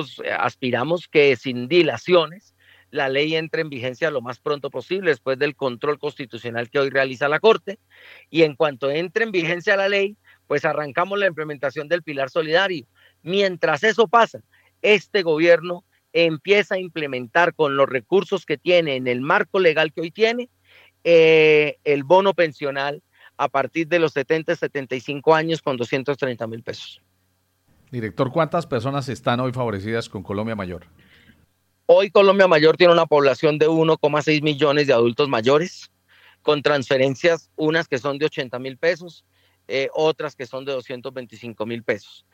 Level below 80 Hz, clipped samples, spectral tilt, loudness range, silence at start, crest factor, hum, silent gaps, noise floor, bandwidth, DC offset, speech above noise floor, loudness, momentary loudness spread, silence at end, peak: -68 dBFS; under 0.1%; -5.5 dB/octave; 8 LU; 0 s; 20 dB; none; none; -67 dBFS; 8.8 kHz; under 0.1%; 47 dB; -20 LUFS; 13 LU; 0.35 s; 0 dBFS